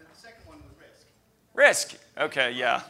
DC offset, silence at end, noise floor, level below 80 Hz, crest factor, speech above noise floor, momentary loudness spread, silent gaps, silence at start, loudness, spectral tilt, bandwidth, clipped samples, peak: under 0.1%; 0.05 s; -64 dBFS; -64 dBFS; 24 dB; 40 dB; 14 LU; none; 0.25 s; -23 LUFS; -1 dB/octave; 16 kHz; under 0.1%; -4 dBFS